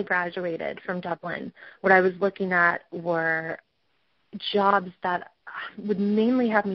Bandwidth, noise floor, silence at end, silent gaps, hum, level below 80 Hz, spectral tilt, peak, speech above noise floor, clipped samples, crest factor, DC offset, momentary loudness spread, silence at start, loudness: 6 kHz; -72 dBFS; 0 s; none; none; -68 dBFS; -3.5 dB/octave; -4 dBFS; 47 dB; under 0.1%; 20 dB; under 0.1%; 15 LU; 0 s; -25 LUFS